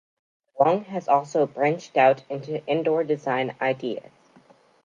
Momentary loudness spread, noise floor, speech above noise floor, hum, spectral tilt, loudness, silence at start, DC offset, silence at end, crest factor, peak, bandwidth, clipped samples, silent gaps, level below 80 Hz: 10 LU; -56 dBFS; 33 dB; none; -6 dB/octave; -24 LUFS; 0.55 s; under 0.1%; 0.85 s; 20 dB; -6 dBFS; 7.6 kHz; under 0.1%; none; -76 dBFS